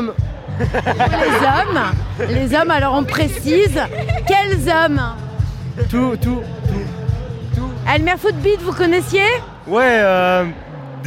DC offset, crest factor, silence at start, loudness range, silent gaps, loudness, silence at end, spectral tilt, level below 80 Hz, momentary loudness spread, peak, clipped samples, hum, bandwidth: under 0.1%; 16 dB; 0 s; 4 LU; none; -17 LUFS; 0 s; -6 dB/octave; -30 dBFS; 9 LU; -2 dBFS; under 0.1%; none; 16.5 kHz